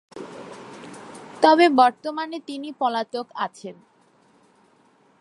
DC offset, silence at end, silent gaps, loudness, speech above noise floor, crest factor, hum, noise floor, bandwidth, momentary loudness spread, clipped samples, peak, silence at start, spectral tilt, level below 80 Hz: under 0.1%; 1.5 s; none; -21 LUFS; 38 dB; 24 dB; none; -59 dBFS; 11.5 kHz; 25 LU; under 0.1%; 0 dBFS; 0.15 s; -4 dB/octave; -76 dBFS